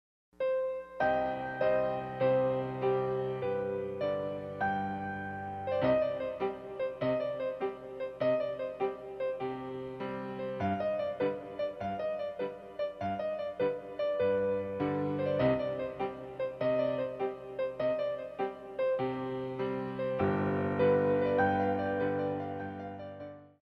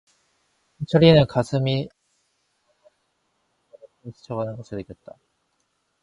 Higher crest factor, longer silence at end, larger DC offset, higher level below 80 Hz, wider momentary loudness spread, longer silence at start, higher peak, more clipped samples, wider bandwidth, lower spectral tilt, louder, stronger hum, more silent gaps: second, 16 dB vs 22 dB; second, 0.15 s vs 1.1 s; neither; second, -64 dBFS vs -52 dBFS; second, 9 LU vs 28 LU; second, 0.4 s vs 0.8 s; second, -16 dBFS vs -2 dBFS; neither; second, 5.8 kHz vs 10.5 kHz; about the same, -8.5 dB/octave vs -7.5 dB/octave; second, -33 LUFS vs -20 LUFS; neither; neither